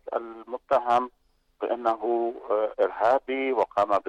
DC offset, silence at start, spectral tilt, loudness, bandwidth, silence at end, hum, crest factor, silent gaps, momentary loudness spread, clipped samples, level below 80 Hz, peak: under 0.1%; 0.05 s; -5.5 dB/octave; -26 LUFS; 10 kHz; 0 s; none; 14 dB; none; 11 LU; under 0.1%; -66 dBFS; -12 dBFS